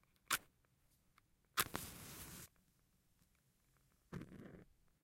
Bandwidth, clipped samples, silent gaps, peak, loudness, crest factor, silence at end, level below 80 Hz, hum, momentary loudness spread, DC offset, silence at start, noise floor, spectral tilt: 16 kHz; under 0.1%; none; -14 dBFS; -45 LUFS; 36 dB; 0.4 s; -70 dBFS; none; 19 LU; under 0.1%; 0.3 s; -78 dBFS; -1.5 dB/octave